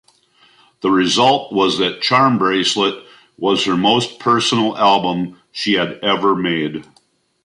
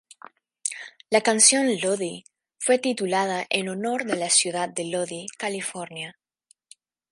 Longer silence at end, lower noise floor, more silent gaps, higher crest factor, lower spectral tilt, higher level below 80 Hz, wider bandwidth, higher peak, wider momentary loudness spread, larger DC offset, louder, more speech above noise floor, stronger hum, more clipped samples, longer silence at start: second, 0.6 s vs 1 s; second, -58 dBFS vs -64 dBFS; neither; second, 16 dB vs 24 dB; first, -4 dB/octave vs -2 dB/octave; first, -58 dBFS vs -78 dBFS; about the same, 11.5 kHz vs 11.5 kHz; about the same, -2 dBFS vs -2 dBFS; second, 10 LU vs 17 LU; neither; first, -16 LUFS vs -23 LUFS; about the same, 42 dB vs 41 dB; neither; neither; first, 0.85 s vs 0.65 s